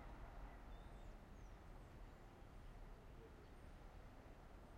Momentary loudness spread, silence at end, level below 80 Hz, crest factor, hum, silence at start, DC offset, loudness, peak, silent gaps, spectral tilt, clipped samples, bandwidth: 4 LU; 0 s; -60 dBFS; 14 dB; none; 0 s; under 0.1%; -62 LUFS; -44 dBFS; none; -6.5 dB/octave; under 0.1%; 15.5 kHz